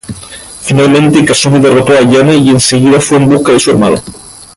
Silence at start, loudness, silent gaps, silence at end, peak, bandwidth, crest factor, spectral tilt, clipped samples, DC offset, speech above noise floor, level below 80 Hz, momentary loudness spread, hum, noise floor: 0.1 s; -7 LUFS; none; 0.1 s; 0 dBFS; 11.5 kHz; 8 dB; -5 dB/octave; under 0.1%; under 0.1%; 22 dB; -38 dBFS; 14 LU; none; -28 dBFS